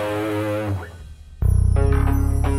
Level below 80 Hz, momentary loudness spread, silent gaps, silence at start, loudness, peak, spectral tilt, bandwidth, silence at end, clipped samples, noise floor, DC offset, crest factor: -22 dBFS; 11 LU; none; 0 s; -21 LUFS; -6 dBFS; -7.5 dB/octave; 14 kHz; 0 s; under 0.1%; -39 dBFS; under 0.1%; 12 dB